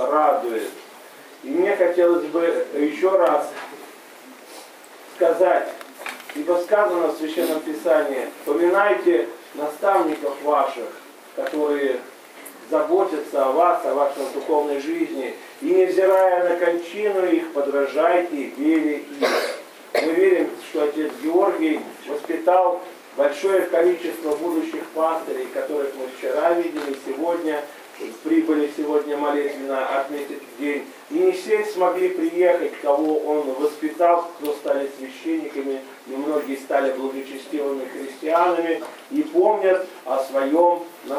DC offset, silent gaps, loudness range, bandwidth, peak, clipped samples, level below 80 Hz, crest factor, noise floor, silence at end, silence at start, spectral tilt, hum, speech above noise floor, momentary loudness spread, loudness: under 0.1%; none; 4 LU; 16 kHz; -4 dBFS; under 0.1%; -82 dBFS; 18 dB; -43 dBFS; 0 s; 0 s; -4 dB/octave; none; 22 dB; 13 LU; -22 LUFS